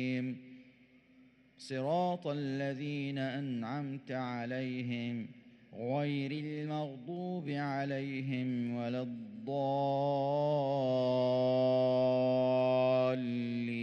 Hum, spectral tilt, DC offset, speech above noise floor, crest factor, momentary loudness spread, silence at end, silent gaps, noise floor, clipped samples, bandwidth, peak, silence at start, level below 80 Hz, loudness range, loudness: none; -8 dB/octave; under 0.1%; 30 dB; 14 dB; 11 LU; 0 s; none; -63 dBFS; under 0.1%; 9 kHz; -20 dBFS; 0 s; -82 dBFS; 8 LU; -34 LUFS